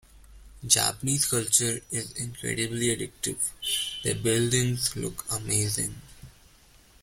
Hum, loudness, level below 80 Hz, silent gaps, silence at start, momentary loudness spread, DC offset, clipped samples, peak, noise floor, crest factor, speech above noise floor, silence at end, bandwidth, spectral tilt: none; -26 LUFS; -52 dBFS; none; 0.15 s; 11 LU; under 0.1%; under 0.1%; -2 dBFS; -56 dBFS; 26 dB; 29 dB; 0.75 s; 16.5 kHz; -3 dB/octave